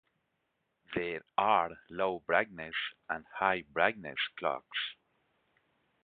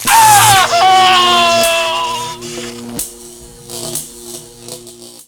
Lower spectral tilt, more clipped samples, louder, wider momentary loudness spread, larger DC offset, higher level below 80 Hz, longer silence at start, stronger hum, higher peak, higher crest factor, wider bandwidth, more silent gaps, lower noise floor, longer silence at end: about the same, -1 dB/octave vs -1 dB/octave; second, under 0.1% vs 0.2%; second, -33 LUFS vs -9 LUFS; second, 9 LU vs 23 LU; neither; second, -70 dBFS vs -44 dBFS; first, 0.9 s vs 0 s; neither; second, -10 dBFS vs 0 dBFS; first, 26 dB vs 12 dB; second, 4.8 kHz vs over 20 kHz; neither; first, -81 dBFS vs -35 dBFS; first, 1.1 s vs 0.15 s